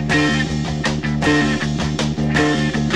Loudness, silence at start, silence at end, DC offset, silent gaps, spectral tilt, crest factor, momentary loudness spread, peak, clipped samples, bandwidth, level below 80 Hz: -18 LUFS; 0 s; 0 s; 0.8%; none; -5 dB/octave; 14 dB; 5 LU; -4 dBFS; under 0.1%; 11.5 kHz; -34 dBFS